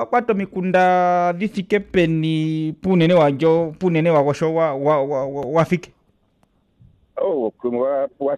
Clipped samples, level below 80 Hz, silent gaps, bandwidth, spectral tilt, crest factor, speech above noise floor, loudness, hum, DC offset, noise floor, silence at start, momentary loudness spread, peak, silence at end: under 0.1%; -54 dBFS; none; 9.8 kHz; -7.5 dB/octave; 12 dB; 44 dB; -19 LUFS; none; under 0.1%; -62 dBFS; 0 s; 8 LU; -6 dBFS; 0 s